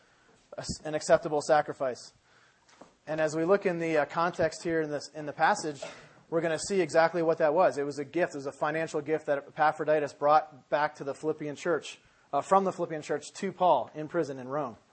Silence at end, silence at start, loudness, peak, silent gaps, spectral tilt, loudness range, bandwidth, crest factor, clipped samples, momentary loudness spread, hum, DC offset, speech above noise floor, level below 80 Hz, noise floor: 0.2 s; 0.5 s; -29 LUFS; -8 dBFS; none; -5 dB/octave; 2 LU; 8.8 kHz; 20 dB; under 0.1%; 11 LU; none; under 0.1%; 34 dB; -64 dBFS; -63 dBFS